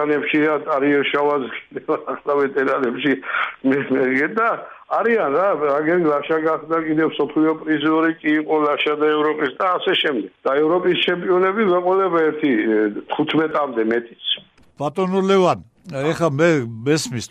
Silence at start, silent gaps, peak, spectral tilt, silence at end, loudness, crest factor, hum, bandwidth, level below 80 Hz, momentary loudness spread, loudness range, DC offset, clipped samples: 0 s; none; -4 dBFS; -5.5 dB/octave; 0.05 s; -19 LUFS; 14 dB; none; 12 kHz; -64 dBFS; 6 LU; 2 LU; under 0.1%; under 0.1%